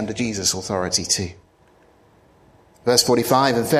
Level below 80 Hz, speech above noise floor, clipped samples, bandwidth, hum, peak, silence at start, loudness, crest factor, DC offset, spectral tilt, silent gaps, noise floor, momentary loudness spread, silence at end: -54 dBFS; 35 dB; under 0.1%; 15.5 kHz; none; 0 dBFS; 0 s; -19 LUFS; 22 dB; under 0.1%; -3 dB/octave; none; -55 dBFS; 8 LU; 0 s